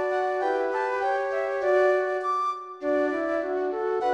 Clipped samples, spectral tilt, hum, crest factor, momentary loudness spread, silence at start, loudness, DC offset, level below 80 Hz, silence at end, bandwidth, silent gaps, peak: under 0.1%; -4.5 dB/octave; none; 14 dB; 6 LU; 0 s; -26 LUFS; under 0.1%; -66 dBFS; 0 s; 9.2 kHz; none; -12 dBFS